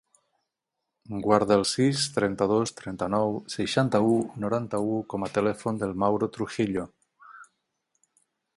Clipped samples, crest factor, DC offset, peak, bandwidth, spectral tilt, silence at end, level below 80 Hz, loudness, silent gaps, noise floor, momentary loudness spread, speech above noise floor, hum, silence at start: under 0.1%; 22 dB; under 0.1%; -4 dBFS; 11.5 kHz; -5.5 dB/octave; 1.15 s; -58 dBFS; -26 LUFS; none; -84 dBFS; 8 LU; 58 dB; none; 1.1 s